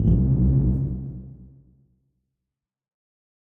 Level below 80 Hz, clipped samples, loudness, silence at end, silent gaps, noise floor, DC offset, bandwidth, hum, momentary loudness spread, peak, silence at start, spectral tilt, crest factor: -30 dBFS; under 0.1%; -22 LUFS; 2 s; none; -86 dBFS; under 0.1%; 1.5 kHz; none; 20 LU; -8 dBFS; 0 s; -13.5 dB/octave; 16 dB